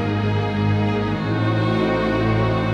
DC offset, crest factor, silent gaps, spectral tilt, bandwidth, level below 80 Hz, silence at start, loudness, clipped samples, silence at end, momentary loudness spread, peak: under 0.1%; 12 dB; none; -8 dB/octave; 7 kHz; -38 dBFS; 0 s; -20 LUFS; under 0.1%; 0 s; 2 LU; -8 dBFS